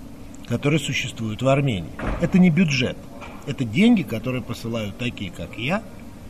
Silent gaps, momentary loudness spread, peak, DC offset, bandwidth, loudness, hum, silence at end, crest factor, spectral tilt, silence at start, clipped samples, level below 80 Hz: none; 16 LU; -6 dBFS; 0.7%; 13.5 kHz; -22 LUFS; none; 0 s; 16 dB; -6 dB/octave; 0 s; under 0.1%; -42 dBFS